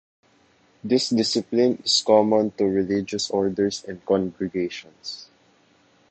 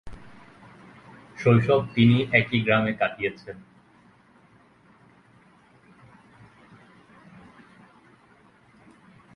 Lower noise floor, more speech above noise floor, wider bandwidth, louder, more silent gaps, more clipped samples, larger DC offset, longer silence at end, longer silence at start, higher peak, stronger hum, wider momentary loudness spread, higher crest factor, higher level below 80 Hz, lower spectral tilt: about the same, -60 dBFS vs -57 dBFS; about the same, 37 dB vs 35 dB; first, 9 kHz vs 6.6 kHz; about the same, -22 LUFS vs -22 LUFS; neither; neither; neither; second, 0.85 s vs 5.8 s; first, 0.85 s vs 0.05 s; about the same, -2 dBFS vs -4 dBFS; neither; second, 17 LU vs 25 LU; about the same, 20 dB vs 24 dB; about the same, -60 dBFS vs -58 dBFS; second, -4.5 dB/octave vs -8 dB/octave